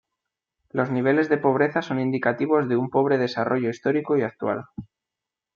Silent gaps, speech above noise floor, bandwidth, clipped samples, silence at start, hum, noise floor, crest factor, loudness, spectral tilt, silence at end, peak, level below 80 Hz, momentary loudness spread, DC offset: none; 65 dB; 7.2 kHz; under 0.1%; 0.75 s; none; -87 dBFS; 18 dB; -23 LUFS; -8 dB/octave; 0.7 s; -6 dBFS; -66 dBFS; 8 LU; under 0.1%